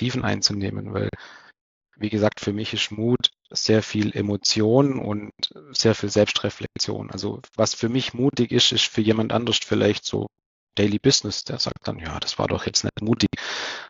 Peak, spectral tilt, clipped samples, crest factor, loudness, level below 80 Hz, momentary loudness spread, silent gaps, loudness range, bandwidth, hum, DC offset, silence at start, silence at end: -4 dBFS; -4 dB/octave; under 0.1%; 20 dB; -23 LUFS; -52 dBFS; 11 LU; 1.61-1.81 s, 10.46-10.67 s; 3 LU; 7.8 kHz; none; under 0.1%; 0 s; 0.05 s